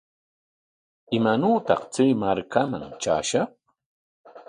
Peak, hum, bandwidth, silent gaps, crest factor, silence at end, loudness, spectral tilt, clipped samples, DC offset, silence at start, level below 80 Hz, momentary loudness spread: -4 dBFS; none; 10.5 kHz; 3.86-4.24 s; 20 dB; 0.05 s; -24 LUFS; -5 dB/octave; under 0.1%; under 0.1%; 1.1 s; -60 dBFS; 8 LU